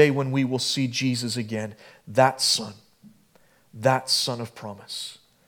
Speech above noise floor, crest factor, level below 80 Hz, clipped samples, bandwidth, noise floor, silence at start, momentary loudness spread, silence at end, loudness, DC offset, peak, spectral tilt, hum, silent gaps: 34 dB; 22 dB; -74 dBFS; under 0.1%; 18.5 kHz; -59 dBFS; 0 s; 16 LU; 0.35 s; -24 LUFS; under 0.1%; -4 dBFS; -4 dB/octave; none; none